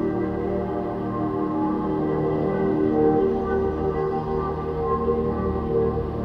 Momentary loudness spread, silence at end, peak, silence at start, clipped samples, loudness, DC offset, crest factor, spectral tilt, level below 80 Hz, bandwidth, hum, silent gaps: 6 LU; 0 s; -8 dBFS; 0 s; under 0.1%; -24 LUFS; under 0.1%; 14 dB; -10.5 dB/octave; -38 dBFS; 5.8 kHz; none; none